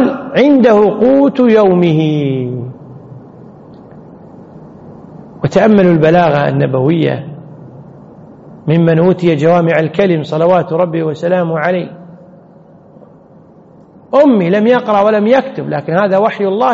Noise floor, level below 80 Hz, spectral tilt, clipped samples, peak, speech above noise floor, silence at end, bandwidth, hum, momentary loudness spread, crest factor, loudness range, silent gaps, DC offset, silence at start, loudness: -40 dBFS; -52 dBFS; -6.5 dB/octave; under 0.1%; 0 dBFS; 30 dB; 0 s; 7.6 kHz; none; 11 LU; 12 dB; 7 LU; none; under 0.1%; 0 s; -11 LUFS